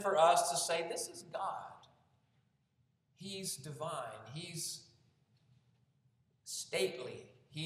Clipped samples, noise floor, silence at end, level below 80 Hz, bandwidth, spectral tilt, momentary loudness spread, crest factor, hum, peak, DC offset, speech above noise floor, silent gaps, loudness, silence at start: under 0.1%; -77 dBFS; 0 s; -84 dBFS; 16 kHz; -2.5 dB/octave; 19 LU; 22 dB; none; -16 dBFS; under 0.1%; 41 dB; none; -37 LUFS; 0 s